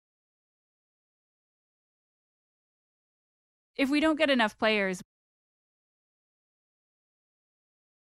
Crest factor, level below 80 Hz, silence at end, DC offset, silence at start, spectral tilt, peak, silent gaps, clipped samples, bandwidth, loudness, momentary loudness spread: 24 dB; -70 dBFS; 3.15 s; under 0.1%; 3.8 s; -4.5 dB/octave; -10 dBFS; none; under 0.1%; 13 kHz; -26 LUFS; 12 LU